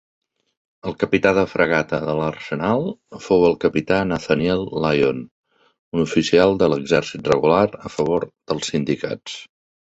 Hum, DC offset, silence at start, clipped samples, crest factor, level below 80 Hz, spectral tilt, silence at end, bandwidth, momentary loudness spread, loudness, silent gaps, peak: none; under 0.1%; 0.85 s; under 0.1%; 18 dB; -48 dBFS; -6 dB/octave; 0.45 s; 8.2 kHz; 12 LU; -20 LUFS; 5.31-5.43 s, 5.79-5.92 s; -2 dBFS